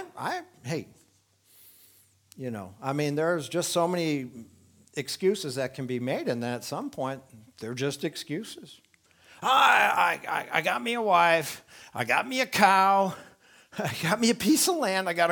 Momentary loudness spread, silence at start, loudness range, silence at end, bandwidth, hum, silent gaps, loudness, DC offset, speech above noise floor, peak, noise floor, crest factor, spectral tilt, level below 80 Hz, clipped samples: 16 LU; 0 s; 9 LU; 0 s; 19.5 kHz; none; none; -26 LUFS; under 0.1%; 38 dB; -4 dBFS; -65 dBFS; 24 dB; -3.5 dB/octave; -72 dBFS; under 0.1%